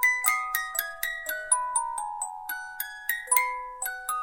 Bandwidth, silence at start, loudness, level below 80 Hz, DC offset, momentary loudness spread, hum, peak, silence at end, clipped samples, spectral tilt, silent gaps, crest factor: 17 kHz; 0 s; -28 LUFS; -62 dBFS; under 0.1%; 10 LU; none; -4 dBFS; 0 s; under 0.1%; 3.5 dB/octave; none; 26 dB